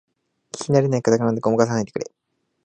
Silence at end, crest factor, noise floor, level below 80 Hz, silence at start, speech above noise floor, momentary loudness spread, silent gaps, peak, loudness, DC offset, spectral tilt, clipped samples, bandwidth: 0.6 s; 20 dB; -42 dBFS; -60 dBFS; 0.55 s; 22 dB; 14 LU; none; 0 dBFS; -20 LUFS; under 0.1%; -6.5 dB/octave; under 0.1%; 9.6 kHz